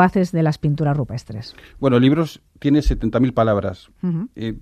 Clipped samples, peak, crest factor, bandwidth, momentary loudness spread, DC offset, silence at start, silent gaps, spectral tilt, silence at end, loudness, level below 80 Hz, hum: under 0.1%; -2 dBFS; 16 dB; 13.5 kHz; 13 LU; under 0.1%; 0 s; none; -8 dB/octave; 0 s; -20 LUFS; -32 dBFS; none